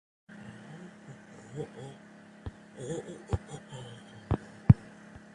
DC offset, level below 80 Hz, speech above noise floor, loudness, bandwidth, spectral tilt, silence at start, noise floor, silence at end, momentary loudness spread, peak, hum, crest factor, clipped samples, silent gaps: under 0.1%; -46 dBFS; 12 dB; -31 LUFS; 10.5 kHz; -8 dB/octave; 0.3 s; -51 dBFS; 0.15 s; 26 LU; -4 dBFS; none; 30 dB; under 0.1%; none